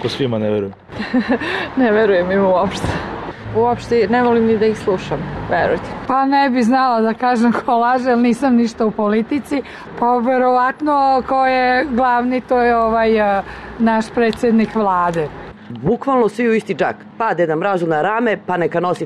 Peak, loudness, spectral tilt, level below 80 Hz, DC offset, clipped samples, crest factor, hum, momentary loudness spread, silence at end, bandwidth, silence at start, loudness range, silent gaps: -6 dBFS; -16 LUFS; -6.5 dB/octave; -44 dBFS; 0.1%; under 0.1%; 10 dB; none; 8 LU; 0 s; 11.5 kHz; 0 s; 2 LU; none